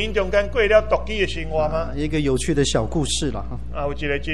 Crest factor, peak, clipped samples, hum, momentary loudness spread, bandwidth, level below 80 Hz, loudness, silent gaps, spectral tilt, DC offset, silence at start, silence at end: 18 dB; -4 dBFS; under 0.1%; none; 10 LU; 12.5 kHz; -32 dBFS; -22 LUFS; none; -4.5 dB/octave; 3%; 0 s; 0 s